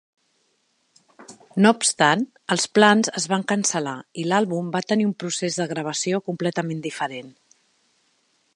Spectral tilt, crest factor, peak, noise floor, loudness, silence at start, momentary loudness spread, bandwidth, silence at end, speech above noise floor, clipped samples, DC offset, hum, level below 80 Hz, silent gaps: -3.5 dB/octave; 22 dB; 0 dBFS; -68 dBFS; -22 LUFS; 1.2 s; 12 LU; 11.5 kHz; 1.25 s; 46 dB; under 0.1%; under 0.1%; none; -72 dBFS; none